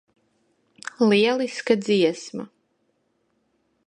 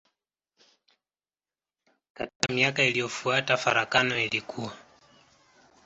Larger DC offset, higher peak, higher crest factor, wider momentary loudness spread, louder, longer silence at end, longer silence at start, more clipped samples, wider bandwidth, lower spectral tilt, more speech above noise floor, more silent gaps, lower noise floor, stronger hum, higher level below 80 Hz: neither; about the same, -4 dBFS vs -2 dBFS; second, 20 dB vs 28 dB; first, 20 LU vs 15 LU; first, -21 LUFS vs -25 LUFS; first, 1.4 s vs 1.05 s; second, 1 s vs 2.2 s; neither; first, 10.5 kHz vs 8.2 kHz; first, -5 dB/octave vs -3 dB/octave; second, 49 dB vs over 63 dB; second, none vs 2.35-2.40 s; second, -70 dBFS vs under -90 dBFS; neither; second, -74 dBFS vs -66 dBFS